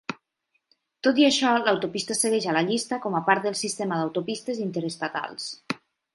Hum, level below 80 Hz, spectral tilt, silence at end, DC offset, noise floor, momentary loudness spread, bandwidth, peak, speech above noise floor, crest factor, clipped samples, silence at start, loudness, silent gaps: none; -74 dBFS; -3.5 dB/octave; 0.4 s; under 0.1%; -75 dBFS; 14 LU; 12 kHz; -4 dBFS; 50 dB; 22 dB; under 0.1%; 0.1 s; -25 LUFS; none